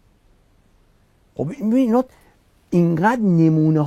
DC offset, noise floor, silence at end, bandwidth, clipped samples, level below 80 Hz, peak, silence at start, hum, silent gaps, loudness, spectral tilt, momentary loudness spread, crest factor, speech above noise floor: under 0.1%; -57 dBFS; 0 s; 8.4 kHz; under 0.1%; -56 dBFS; -6 dBFS; 1.4 s; none; none; -18 LUFS; -9 dB/octave; 13 LU; 14 dB; 40 dB